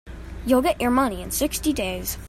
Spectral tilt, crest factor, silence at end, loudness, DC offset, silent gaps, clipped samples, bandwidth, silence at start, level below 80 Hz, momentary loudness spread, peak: -4 dB/octave; 16 dB; 0 s; -23 LUFS; under 0.1%; none; under 0.1%; 16 kHz; 0.05 s; -38 dBFS; 8 LU; -6 dBFS